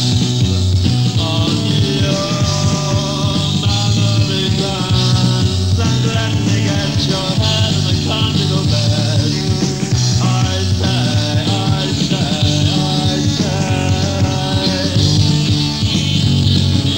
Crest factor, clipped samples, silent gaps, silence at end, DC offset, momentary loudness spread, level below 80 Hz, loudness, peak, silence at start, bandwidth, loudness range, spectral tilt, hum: 14 dB; under 0.1%; none; 0 s; 0.7%; 3 LU; -32 dBFS; -15 LUFS; 0 dBFS; 0 s; 16.5 kHz; 1 LU; -5 dB/octave; none